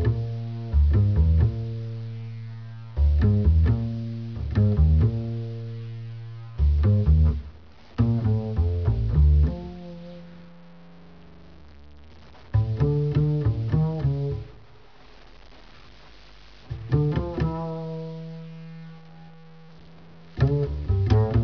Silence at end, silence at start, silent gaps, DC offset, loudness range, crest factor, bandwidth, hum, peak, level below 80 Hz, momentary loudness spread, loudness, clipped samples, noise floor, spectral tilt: 0 s; 0 s; none; 0.4%; 8 LU; 16 dB; 5.4 kHz; none; -8 dBFS; -28 dBFS; 19 LU; -24 LUFS; under 0.1%; -51 dBFS; -10.5 dB/octave